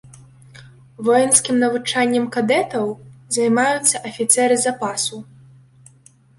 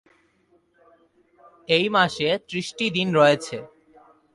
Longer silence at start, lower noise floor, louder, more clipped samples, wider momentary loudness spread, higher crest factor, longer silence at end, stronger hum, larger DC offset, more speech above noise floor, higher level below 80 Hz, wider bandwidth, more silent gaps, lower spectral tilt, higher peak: second, 0.55 s vs 1.7 s; second, -51 dBFS vs -63 dBFS; first, -18 LUFS vs -21 LUFS; neither; second, 10 LU vs 16 LU; about the same, 20 dB vs 20 dB; first, 1.15 s vs 0.7 s; neither; neither; second, 33 dB vs 42 dB; about the same, -62 dBFS vs -64 dBFS; about the same, 12 kHz vs 11.5 kHz; neither; second, -2.5 dB/octave vs -4.5 dB/octave; first, 0 dBFS vs -6 dBFS